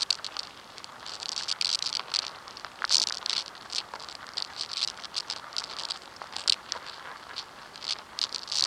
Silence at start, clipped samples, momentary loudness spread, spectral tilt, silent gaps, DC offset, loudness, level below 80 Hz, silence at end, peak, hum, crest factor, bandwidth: 0 s; under 0.1%; 14 LU; 1.5 dB/octave; none; under 0.1%; -31 LUFS; -70 dBFS; 0 s; -4 dBFS; none; 30 dB; 16.5 kHz